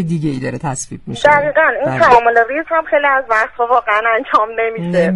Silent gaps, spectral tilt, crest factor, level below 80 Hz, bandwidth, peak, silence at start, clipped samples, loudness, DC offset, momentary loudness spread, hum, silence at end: none; -5 dB/octave; 14 dB; -46 dBFS; 11.5 kHz; 0 dBFS; 0 s; under 0.1%; -13 LUFS; under 0.1%; 11 LU; none; 0 s